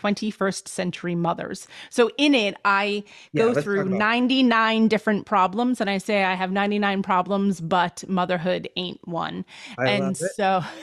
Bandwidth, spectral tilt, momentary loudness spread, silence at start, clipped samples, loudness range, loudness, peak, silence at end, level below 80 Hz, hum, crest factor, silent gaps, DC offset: 13 kHz; -5 dB/octave; 10 LU; 0.05 s; under 0.1%; 4 LU; -23 LUFS; -8 dBFS; 0 s; -64 dBFS; none; 16 dB; none; under 0.1%